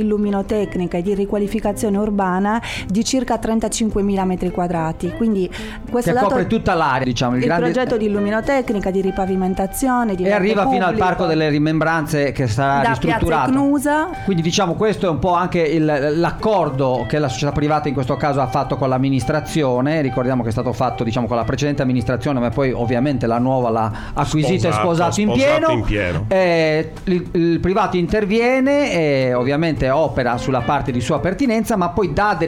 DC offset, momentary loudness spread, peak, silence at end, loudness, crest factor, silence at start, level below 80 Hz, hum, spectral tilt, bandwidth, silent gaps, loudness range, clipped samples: under 0.1%; 4 LU; -6 dBFS; 0 s; -18 LUFS; 12 dB; 0 s; -36 dBFS; none; -6 dB/octave; 16 kHz; none; 2 LU; under 0.1%